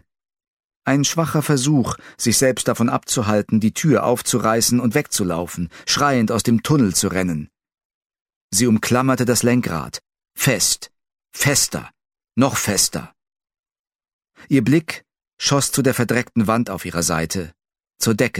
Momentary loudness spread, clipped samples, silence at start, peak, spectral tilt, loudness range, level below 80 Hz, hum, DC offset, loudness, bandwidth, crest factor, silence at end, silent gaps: 11 LU; under 0.1%; 0.85 s; -2 dBFS; -4 dB/octave; 3 LU; -50 dBFS; none; under 0.1%; -18 LUFS; 16.5 kHz; 18 dB; 0 s; 7.85-8.10 s, 8.21-8.25 s, 8.36-8.49 s, 13.59-13.63 s, 13.79-13.84 s, 14.13-14.19 s, 15.33-15.37 s